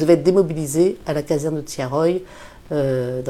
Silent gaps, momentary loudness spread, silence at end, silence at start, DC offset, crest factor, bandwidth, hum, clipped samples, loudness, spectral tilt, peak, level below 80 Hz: none; 10 LU; 0 s; 0 s; under 0.1%; 18 dB; 15.5 kHz; none; under 0.1%; -20 LUFS; -6.5 dB/octave; -2 dBFS; -48 dBFS